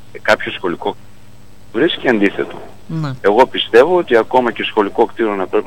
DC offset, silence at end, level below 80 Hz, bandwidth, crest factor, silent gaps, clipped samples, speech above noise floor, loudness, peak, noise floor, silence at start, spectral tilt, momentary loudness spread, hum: 2%; 0 s; -48 dBFS; 16.5 kHz; 16 dB; none; under 0.1%; 29 dB; -15 LUFS; 0 dBFS; -44 dBFS; 0.15 s; -6 dB/octave; 14 LU; 50 Hz at -45 dBFS